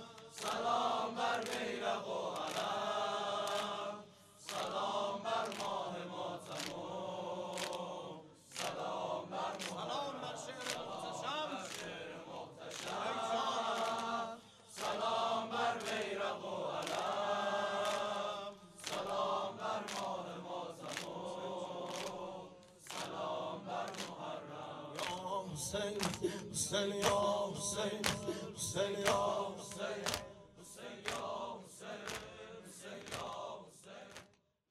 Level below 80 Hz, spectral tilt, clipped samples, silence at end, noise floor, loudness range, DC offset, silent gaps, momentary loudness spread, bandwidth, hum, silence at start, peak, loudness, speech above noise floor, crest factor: -72 dBFS; -3 dB/octave; under 0.1%; 0.45 s; -67 dBFS; 7 LU; under 0.1%; none; 13 LU; 15.5 kHz; none; 0 s; -12 dBFS; -40 LUFS; 29 dB; 28 dB